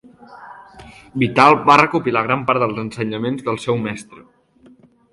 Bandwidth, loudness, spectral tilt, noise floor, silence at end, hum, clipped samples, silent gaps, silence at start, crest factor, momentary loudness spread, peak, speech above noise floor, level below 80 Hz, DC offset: 11.5 kHz; -16 LUFS; -6 dB/octave; -50 dBFS; 0.95 s; none; under 0.1%; none; 0.3 s; 18 dB; 13 LU; 0 dBFS; 33 dB; -56 dBFS; under 0.1%